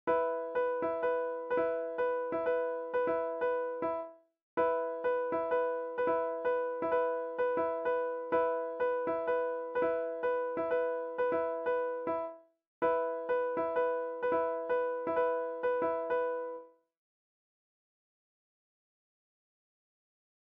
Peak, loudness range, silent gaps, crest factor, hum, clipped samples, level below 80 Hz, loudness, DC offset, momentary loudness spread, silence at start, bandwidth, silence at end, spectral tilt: -20 dBFS; 3 LU; 4.42-4.57 s, 12.67-12.82 s; 14 dB; none; under 0.1%; -74 dBFS; -33 LUFS; under 0.1%; 3 LU; 0.05 s; 3.7 kHz; 3.8 s; -3.5 dB/octave